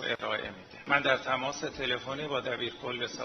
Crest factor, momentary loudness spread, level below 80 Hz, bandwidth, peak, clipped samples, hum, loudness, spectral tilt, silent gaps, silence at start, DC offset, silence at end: 22 dB; 8 LU; -62 dBFS; 6.6 kHz; -10 dBFS; under 0.1%; none; -31 LUFS; -3.5 dB/octave; none; 0 s; under 0.1%; 0 s